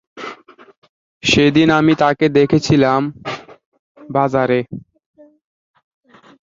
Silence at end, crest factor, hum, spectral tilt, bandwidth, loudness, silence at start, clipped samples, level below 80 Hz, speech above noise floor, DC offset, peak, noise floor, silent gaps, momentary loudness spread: 1.65 s; 16 dB; none; -5.5 dB/octave; 7.8 kHz; -14 LUFS; 0.15 s; under 0.1%; -48 dBFS; 25 dB; under 0.1%; -2 dBFS; -39 dBFS; 0.77-0.82 s, 0.89-1.21 s, 3.66-3.72 s, 3.79-3.95 s; 19 LU